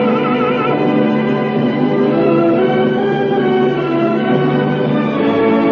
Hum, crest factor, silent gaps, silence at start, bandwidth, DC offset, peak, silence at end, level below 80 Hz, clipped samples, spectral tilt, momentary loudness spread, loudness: none; 12 dB; none; 0 s; 6.2 kHz; under 0.1%; -2 dBFS; 0 s; -50 dBFS; under 0.1%; -9 dB/octave; 3 LU; -14 LUFS